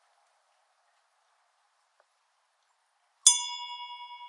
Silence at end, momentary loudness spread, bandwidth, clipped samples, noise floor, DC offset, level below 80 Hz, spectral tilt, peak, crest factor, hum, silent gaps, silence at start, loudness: 0 s; 20 LU; 11 kHz; under 0.1%; -73 dBFS; under 0.1%; under -90 dBFS; 11.5 dB/octave; -2 dBFS; 32 dB; none; none; 3.25 s; -24 LUFS